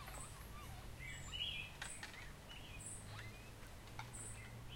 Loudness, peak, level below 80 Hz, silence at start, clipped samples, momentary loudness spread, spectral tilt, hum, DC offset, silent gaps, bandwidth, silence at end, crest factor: -50 LUFS; -32 dBFS; -58 dBFS; 0 s; under 0.1%; 10 LU; -2.5 dB/octave; none; under 0.1%; none; 16.5 kHz; 0 s; 18 dB